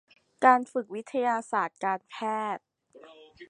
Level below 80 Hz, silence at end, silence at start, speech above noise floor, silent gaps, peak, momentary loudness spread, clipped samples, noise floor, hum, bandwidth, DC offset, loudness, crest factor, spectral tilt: -80 dBFS; 0.05 s; 0.4 s; 26 dB; none; -6 dBFS; 12 LU; under 0.1%; -53 dBFS; none; 10.5 kHz; under 0.1%; -28 LUFS; 24 dB; -4.5 dB/octave